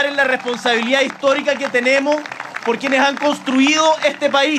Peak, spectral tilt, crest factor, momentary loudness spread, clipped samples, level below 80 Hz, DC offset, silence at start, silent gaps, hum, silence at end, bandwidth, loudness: 0 dBFS; -2.5 dB/octave; 16 dB; 6 LU; under 0.1%; -76 dBFS; under 0.1%; 0 s; none; none; 0 s; 13.5 kHz; -16 LUFS